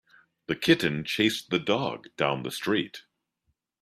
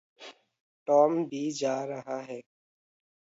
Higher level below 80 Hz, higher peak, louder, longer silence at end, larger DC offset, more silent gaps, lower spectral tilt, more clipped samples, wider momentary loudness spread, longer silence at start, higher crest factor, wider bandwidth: first, -64 dBFS vs -84 dBFS; first, -6 dBFS vs -10 dBFS; about the same, -27 LUFS vs -28 LUFS; about the same, 0.85 s vs 0.8 s; neither; second, none vs 0.60-0.86 s; about the same, -4.5 dB/octave vs -5 dB/octave; neither; second, 12 LU vs 25 LU; first, 0.5 s vs 0.2 s; about the same, 22 dB vs 20 dB; first, 15 kHz vs 8 kHz